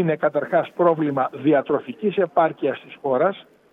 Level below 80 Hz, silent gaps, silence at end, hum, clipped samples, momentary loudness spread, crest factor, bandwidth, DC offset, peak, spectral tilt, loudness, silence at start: -70 dBFS; none; 0.3 s; none; under 0.1%; 7 LU; 16 dB; 4 kHz; under 0.1%; -6 dBFS; -9 dB/octave; -21 LUFS; 0 s